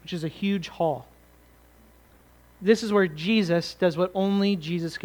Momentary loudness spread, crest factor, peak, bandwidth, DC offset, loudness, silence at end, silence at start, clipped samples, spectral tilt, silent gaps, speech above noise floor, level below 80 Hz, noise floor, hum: 7 LU; 20 dB; -6 dBFS; 19.5 kHz; under 0.1%; -25 LUFS; 0.05 s; 0.05 s; under 0.1%; -6 dB/octave; none; 31 dB; -58 dBFS; -55 dBFS; none